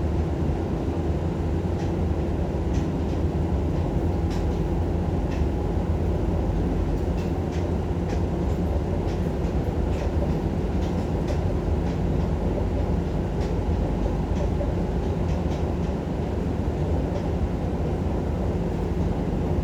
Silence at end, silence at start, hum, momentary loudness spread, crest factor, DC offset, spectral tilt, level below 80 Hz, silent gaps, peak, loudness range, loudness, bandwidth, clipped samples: 0 s; 0 s; none; 1 LU; 14 dB; under 0.1%; -8.5 dB/octave; -30 dBFS; none; -10 dBFS; 1 LU; -26 LUFS; 8.4 kHz; under 0.1%